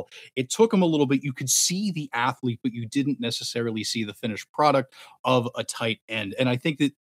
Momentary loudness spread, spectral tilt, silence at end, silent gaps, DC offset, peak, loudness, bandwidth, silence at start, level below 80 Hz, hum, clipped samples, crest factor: 10 LU; -4 dB/octave; 0.15 s; 4.49-4.54 s, 5.19-5.24 s, 6.02-6.08 s; under 0.1%; -6 dBFS; -25 LUFS; 16 kHz; 0 s; -78 dBFS; none; under 0.1%; 20 dB